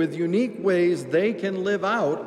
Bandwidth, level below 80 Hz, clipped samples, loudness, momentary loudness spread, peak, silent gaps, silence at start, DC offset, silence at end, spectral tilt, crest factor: 11 kHz; -74 dBFS; under 0.1%; -23 LUFS; 3 LU; -10 dBFS; none; 0 s; under 0.1%; 0 s; -6.5 dB/octave; 14 dB